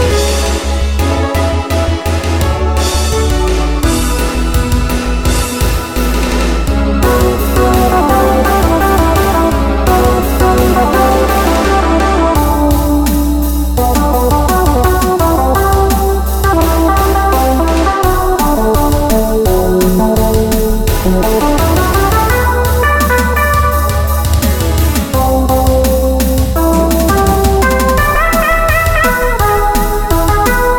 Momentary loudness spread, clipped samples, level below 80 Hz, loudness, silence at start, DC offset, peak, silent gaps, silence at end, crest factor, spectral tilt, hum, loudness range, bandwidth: 4 LU; under 0.1%; -14 dBFS; -11 LUFS; 0 s; under 0.1%; 0 dBFS; none; 0 s; 10 dB; -5.5 dB/octave; none; 3 LU; 17.5 kHz